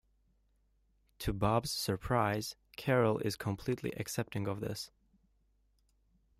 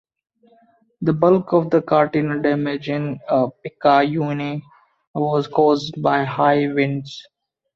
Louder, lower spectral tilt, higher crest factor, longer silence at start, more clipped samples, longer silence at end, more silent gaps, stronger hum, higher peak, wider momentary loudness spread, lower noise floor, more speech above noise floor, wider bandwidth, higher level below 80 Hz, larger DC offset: second, -35 LUFS vs -19 LUFS; second, -5.5 dB/octave vs -7.5 dB/octave; about the same, 20 dB vs 18 dB; first, 1.2 s vs 1 s; neither; first, 1.5 s vs 0.55 s; second, none vs 5.07-5.14 s; neither; second, -16 dBFS vs -2 dBFS; about the same, 10 LU vs 10 LU; first, -73 dBFS vs -57 dBFS; about the same, 39 dB vs 38 dB; first, 15.5 kHz vs 7.4 kHz; first, -56 dBFS vs -62 dBFS; neither